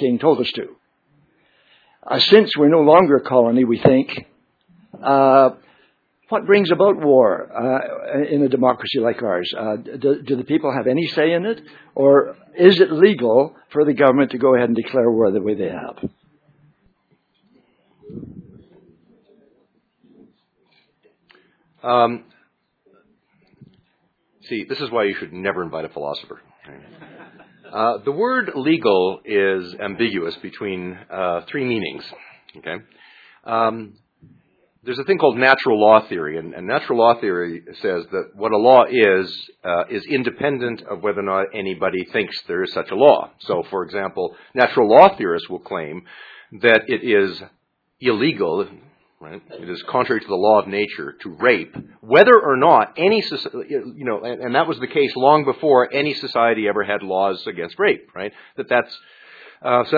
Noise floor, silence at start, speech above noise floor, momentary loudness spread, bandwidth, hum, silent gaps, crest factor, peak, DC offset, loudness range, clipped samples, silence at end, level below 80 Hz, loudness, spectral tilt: -66 dBFS; 0 s; 48 dB; 17 LU; 5.4 kHz; none; none; 18 dB; 0 dBFS; under 0.1%; 10 LU; under 0.1%; 0 s; -64 dBFS; -18 LUFS; -7.5 dB/octave